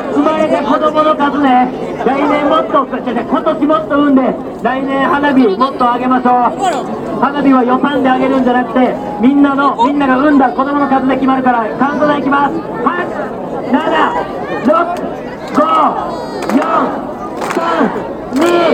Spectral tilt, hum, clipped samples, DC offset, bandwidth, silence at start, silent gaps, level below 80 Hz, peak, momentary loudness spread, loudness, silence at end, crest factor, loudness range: -6 dB/octave; none; under 0.1%; under 0.1%; 9.4 kHz; 0 s; none; -44 dBFS; 0 dBFS; 8 LU; -12 LUFS; 0 s; 12 dB; 3 LU